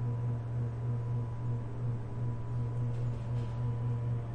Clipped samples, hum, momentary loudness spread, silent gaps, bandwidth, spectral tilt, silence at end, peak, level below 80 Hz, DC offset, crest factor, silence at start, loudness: under 0.1%; none; 2 LU; none; 3.7 kHz; -9.5 dB/octave; 0 s; -24 dBFS; -48 dBFS; under 0.1%; 10 dB; 0 s; -36 LUFS